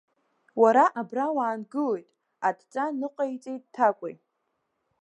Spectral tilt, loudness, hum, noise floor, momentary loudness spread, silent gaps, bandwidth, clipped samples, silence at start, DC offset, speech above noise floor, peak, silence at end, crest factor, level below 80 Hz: -6 dB/octave; -26 LUFS; none; -78 dBFS; 17 LU; none; 9.2 kHz; under 0.1%; 0.55 s; under 0.1%; 52 dB; -8 dBFS; 0.9 s; 20 dB; -86 dBFS